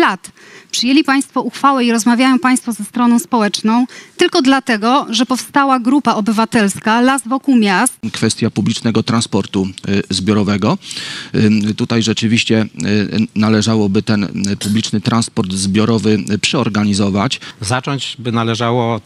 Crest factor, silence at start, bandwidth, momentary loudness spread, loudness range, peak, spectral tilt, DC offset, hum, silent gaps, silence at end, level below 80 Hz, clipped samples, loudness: 14 dB; 0 s; 13.5 kHz; 6 LU; 2 LU; 0 dBFS; -4.5 dB/octave; under 0.1%; none; none; 0.05 s; -54 dBFS; under 0.1%; -14 LUFS